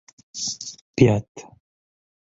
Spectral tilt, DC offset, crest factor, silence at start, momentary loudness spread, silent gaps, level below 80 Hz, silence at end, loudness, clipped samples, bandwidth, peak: -5.5 dB/octave; under 0.1%; 24 dB; 0.35 s; 23 LU; 0.81-0.94 s, 1.28-1.35 s; -52 dBFS; 0.85 s; -22 LUFS; under 0.1%; 8 kHz; -2 dBFS